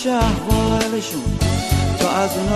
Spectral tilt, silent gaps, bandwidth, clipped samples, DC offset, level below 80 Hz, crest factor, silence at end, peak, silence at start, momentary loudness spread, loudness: -5 dB/octave; none; 13.5 kHz; under 0.1%; under 0.1%; -26 dBFS; 14 dB; 0 s; -4 dBFS; 0 s; 3 LU; -19 LUFS